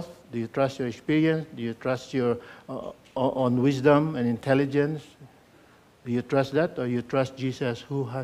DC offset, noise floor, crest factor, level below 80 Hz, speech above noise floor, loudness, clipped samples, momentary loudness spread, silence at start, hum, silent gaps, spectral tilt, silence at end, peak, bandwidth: under 0.1%; -56 dBFS; 20 dB; -62 dBFS; 30 dB; -26 LUFS; under 0.1%; 14 LU; 0 s; none; none; -7.5 dB/octave; 0 s; -6 dBFS; 13.5 kHz